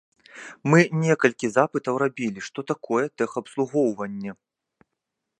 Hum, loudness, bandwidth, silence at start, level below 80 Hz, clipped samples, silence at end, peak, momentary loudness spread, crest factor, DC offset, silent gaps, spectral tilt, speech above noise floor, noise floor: none; -24 LUFS; 11 kHz; 0.35 s; -70 dBFS; under 0.1%; 1.05 s; -2 dBFS; 15 LU; 24 dB; under 0.1%; none; -6.5 dB/octave; 59 dB; -82 dBFS